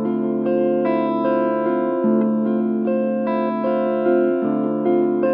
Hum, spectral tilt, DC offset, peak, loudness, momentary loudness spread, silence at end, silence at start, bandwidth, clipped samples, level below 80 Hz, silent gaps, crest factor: none; -11.5 dB/octave; under 0.1%; -6 dBFS; -20 LUFS; 3 LU; 0 s; 0 s; 4.2 kHz; under 0.1%; -74 dBFS; none; 12 dB